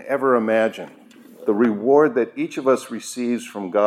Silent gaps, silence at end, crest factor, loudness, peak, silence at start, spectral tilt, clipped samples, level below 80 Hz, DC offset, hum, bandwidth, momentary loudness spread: none; 0 s; 16 dB; -20 LUFS; -4 dBFS; 0 s; -5.5 dB/octave; under 0.1%; -82 dBFS; under 0.1%; none; 15 kHz; 12 LU